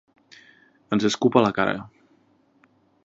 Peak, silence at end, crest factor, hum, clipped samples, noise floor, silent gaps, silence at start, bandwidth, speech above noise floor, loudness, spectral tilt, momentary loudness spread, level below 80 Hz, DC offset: 0 dBFS; 1.2 s; 24 dB; none; under 0.1%; -62 dBFS; none; 0.9 s; 8 kHz; 41 dB; -22 LUFS; -5 dB/octave; 8 LU; -62 dBFS; under 0.1%